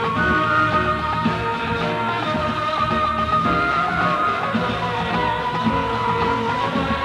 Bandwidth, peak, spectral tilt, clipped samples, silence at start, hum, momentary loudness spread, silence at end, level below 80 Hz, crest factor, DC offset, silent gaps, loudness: 13 kHz; -6 dBFS; -6 dB/octave; under 0.1%; 0 s; none; 4 LU; 0 s; -40 dBFS; 14 dB; under 0.1%; none; -20 LUFS